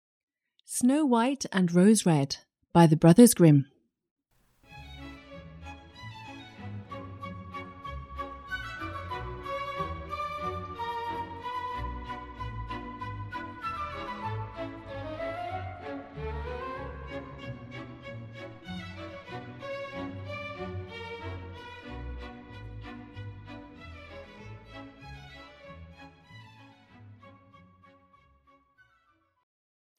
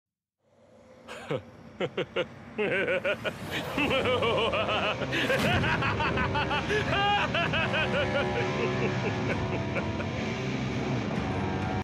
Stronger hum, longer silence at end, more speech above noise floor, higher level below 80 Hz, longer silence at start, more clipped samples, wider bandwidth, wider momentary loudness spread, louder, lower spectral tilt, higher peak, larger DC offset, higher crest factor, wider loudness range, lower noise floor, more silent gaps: neither; first, 2.65 s vs 0 s; first, 48 dB vs 42 dB; about the same, -50 dBFS vs -48 dBFS; second, 0.7 s vs 0.9 s; neither; first, 16 kHz vs 14.5 kHz; first, 24 LU vs 8 LU; about the same, -29 LUFS vs -28 LUFS; about the same, -6 dB/octave vs -5.5 dB/octave; first, -4 dBFS vs -14 dBFS; neither; first, 26 dB vs 16 dB; first, 23 LU vs 5 LU; about the same, -69 dBFS vs -71 dBFS; first, 4.11-4.16 s vs none